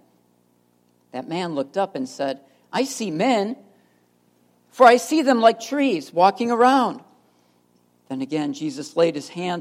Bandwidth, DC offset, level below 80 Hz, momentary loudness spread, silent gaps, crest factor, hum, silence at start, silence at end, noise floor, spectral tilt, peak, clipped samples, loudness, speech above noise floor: 16 kHz; under 0.1%; -80 dBFS; 15 LU; none; 22 dB; 60 Hz at -50 dBFS; 1.15 s; 0 s; -62 dBFS; -4.5 dB/octave; 0 dBFS; under 0.1%; -21 LUFS; 42 dB